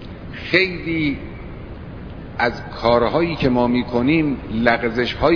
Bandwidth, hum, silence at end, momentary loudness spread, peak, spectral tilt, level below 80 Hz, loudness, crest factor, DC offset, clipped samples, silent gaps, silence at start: 5.4 kHz; none; 0 s; 17 LU; 0 dBFS; -7.5 dB/octave; -38 dBFS; -19 LUFS; 20 dB; under 0.1%; under 0.1%; none; 0 s